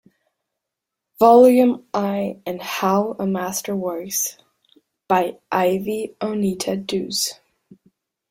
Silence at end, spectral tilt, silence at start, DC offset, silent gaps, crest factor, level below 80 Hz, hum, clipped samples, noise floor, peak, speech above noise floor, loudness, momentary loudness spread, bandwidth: 1 s; -4.5 dB/octave; 1.2 s; under 0.1%; none; 20 dB; -62 dBFS; none; under 0.1%; -83 dBFS; -2 dBFS; 64 dB; -20 LUFS; 13 LU; 16.5 kHz